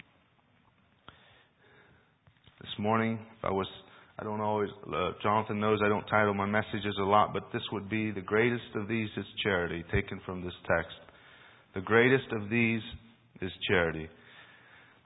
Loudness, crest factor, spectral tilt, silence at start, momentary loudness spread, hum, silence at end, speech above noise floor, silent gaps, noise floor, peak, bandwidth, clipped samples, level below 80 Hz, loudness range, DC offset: -30 LUFS; 24 dB; -2.5 dB/octave; 2.65 s; 15 LU; none; 0.6 s; 37 dB; none; -67 dBFS; -8 dBFS; 3.9 kHz; under 0.1%; -54 dBFS; 7 LU; under 0.1%